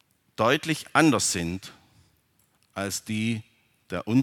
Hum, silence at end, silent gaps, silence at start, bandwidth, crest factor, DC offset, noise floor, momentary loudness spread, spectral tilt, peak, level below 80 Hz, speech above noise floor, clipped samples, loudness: none; 0 s; none; 0.4 s; 18.5 kHz; 24 dB; under 0.1%; -67 dBFS; 17 LU; -4 dB/octave; -2 dBFS; -60 dBFS; 42 dB; under 0.1%; -25 LUFS